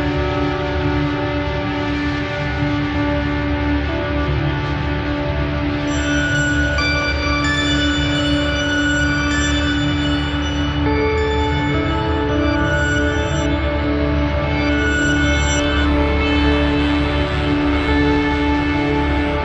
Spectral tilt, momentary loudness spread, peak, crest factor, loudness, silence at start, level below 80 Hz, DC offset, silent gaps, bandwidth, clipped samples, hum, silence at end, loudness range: -5.5 dB/octave; 4 LU; -4 dBFS; 14 dB; -18 LUFS; 0 s; -24 dBFS; under 0.1%; none; 9 kHz; under 0.1%; none; 0 s; 3 LU